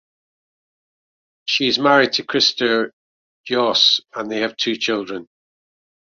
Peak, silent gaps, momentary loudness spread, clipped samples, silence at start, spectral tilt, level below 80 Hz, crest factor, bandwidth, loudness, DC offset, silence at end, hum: -2 dBFS; 2.93-3.44 s; 13 LU; under 0.1%; 1.45 s; -2.5 dB/octave; -64 dBFS; 20 dB; 7.6 kHz; -17 LUFS; under 0.1%; 0.9 s; none